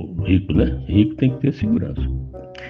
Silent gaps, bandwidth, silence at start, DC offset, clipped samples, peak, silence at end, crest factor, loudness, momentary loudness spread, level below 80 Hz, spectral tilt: none; 6 kHz; 0 s; under 0.1%; under 0.1%; -2 dBFS; 0 s; 16 dB; -20 LUFS; 9 LU; -30 dBFS; -10 dB/octave